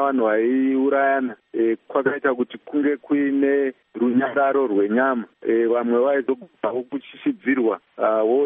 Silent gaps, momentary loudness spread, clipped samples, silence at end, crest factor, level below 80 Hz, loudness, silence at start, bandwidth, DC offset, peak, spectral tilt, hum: none; 7 LU; under 0.1%; 0 s; 14 dB; -72 dBFS; -21 LUFS; 0 s; 3.8 kHz; under 0.1%; -6 dBFS; -4.5 dB/octave; none